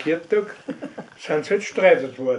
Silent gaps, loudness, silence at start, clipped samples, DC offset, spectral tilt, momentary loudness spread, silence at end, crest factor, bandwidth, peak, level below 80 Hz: none; -21 LUFS; 0 s; under 0.1%; under 0.1%; -5 dB/octave; 18 LU; 0 s; 18 dB; 10 kHz; -4 dBFS; -74 dBFS